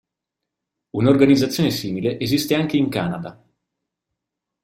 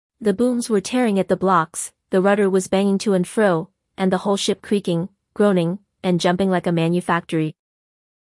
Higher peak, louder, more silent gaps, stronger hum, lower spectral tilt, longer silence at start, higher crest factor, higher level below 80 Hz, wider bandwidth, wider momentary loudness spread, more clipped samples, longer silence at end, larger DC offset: about the same, -2 dBFS vs -4 dBFS; about the same, -19 LUFS vs -20 LUFS; neither; neither; about the same, -6 dB/octave vs -5.5 dB/octave; first, 0.95 s vs 0.2 s; about the same, 18 dB vs 16 dB; first, -54 dBFS vs -60 dBFS; first, 16.5 kHz vs 12 kHz; first, 14 LU vs 7 LU; neither; first, 1.3 s vs 0.8 s; neither